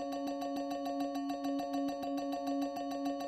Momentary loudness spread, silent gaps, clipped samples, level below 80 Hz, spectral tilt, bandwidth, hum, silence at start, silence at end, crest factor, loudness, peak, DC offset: 2 LU; none; under 0.1%; -72 dBFS; -4.5 dB/octave; 15.5 kHz; none; 0 s; 0 s; 12 dB; -38 LUFS; -26 dBFS; under 0.1%